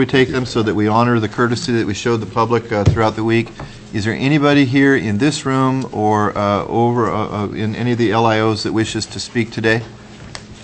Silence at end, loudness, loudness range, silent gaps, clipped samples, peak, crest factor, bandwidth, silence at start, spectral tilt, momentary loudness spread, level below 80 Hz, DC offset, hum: 0 s; -16 LUFS; 2 LU; none; under 0.1%; 0 dBFS; 16 dB; 8.6 kHz; 0 s; -6 dB/octave; 8 LU; -40 dBFS; under 0.1%; none